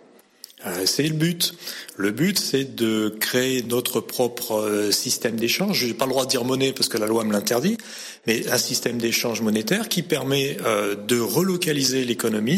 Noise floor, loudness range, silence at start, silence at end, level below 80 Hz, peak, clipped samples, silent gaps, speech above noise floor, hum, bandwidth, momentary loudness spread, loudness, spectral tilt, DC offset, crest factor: -48 dBFS; 1 LU; 0.6 s; 0 s; -66 dBFS; -8 dBFS; under 0.1%; none; 25 dB; none; 16.5 kHz; 4 LU; -22 LUFS; -3.5 dB/octave; under 0.1%; 16 dB